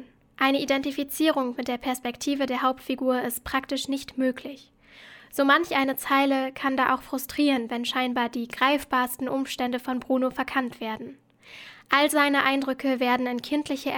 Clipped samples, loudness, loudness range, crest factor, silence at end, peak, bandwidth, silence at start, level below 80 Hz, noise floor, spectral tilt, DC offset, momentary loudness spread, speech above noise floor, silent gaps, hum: under 0.1%; -25 LUFS; 4 LU; 22 dB; 0 s; -4 dBFS; over 20 kHz; 0 s; -60 dBFS; -50 dBFS; -3 dB/octave; under 0.1%; 9 LU; 24 dB; none; none